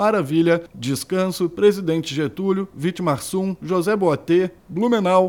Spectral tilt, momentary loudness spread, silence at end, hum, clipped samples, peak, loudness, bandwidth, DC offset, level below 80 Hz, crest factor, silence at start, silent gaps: -6 dB/octave; 7 LU; 0 s; none; under 0.1%; -4 dBFS; -21 LUFS; 18 kHz; under 0.1%; -58 dBFS; 16 dB; 0 s; none